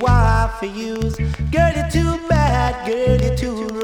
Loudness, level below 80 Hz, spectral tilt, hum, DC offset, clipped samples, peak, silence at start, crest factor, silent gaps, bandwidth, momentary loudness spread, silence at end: -19 LUFS; -24 dBFS; -6.5 dB/octave; none; under 0.1%; under 0.1%; -4 dBFS; 0 s; 14 dB; none; 16.5 kHz; 8 LU; 0 s